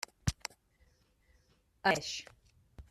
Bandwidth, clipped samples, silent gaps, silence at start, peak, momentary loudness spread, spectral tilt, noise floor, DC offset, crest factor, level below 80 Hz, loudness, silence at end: 14 kHz; under 0.1%; none; 0.25 s; -12 dBFS; 15 LU; -3.5 dB/octave; -70 dBFS; under 0.1%; 28 dB; -54 dBFS; -36 LUFS; 0.1 s